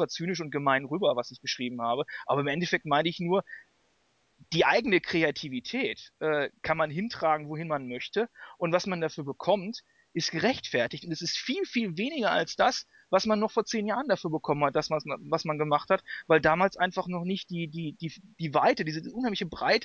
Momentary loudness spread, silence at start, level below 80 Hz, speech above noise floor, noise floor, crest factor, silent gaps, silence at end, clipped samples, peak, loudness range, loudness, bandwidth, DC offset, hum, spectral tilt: 9 LU; 0 s; -64 dBFS; 42 dB; -70 dBFS; 18 dB; none; 0 s; under 0.1%; -10 dBFS; 3 LU; -29 LUFS; 7.4 kHz; under 0.1%; none; -5 dB/octave